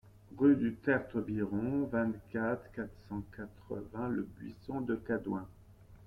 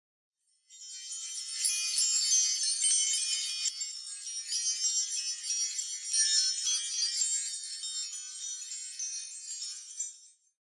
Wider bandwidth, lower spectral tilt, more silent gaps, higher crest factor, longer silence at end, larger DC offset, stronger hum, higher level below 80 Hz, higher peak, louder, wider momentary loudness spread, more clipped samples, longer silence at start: second, 5.2 kHz vs 12 kHz; first, -9.5 dB/octave vs 13 dB/octave; neither; about the same, 20 dB vs 20 dB; second, 0 s vs 0.5 s; neither; neither; first, -60 dBFS vs under -90 dBFS; about the same, -16 dBFS vs -14 dBFS; second, -35 LUFS vs -30 LUFS; about the same, 15 LU vs 13 LU; neither; second, 0.05 s vs 0.7 s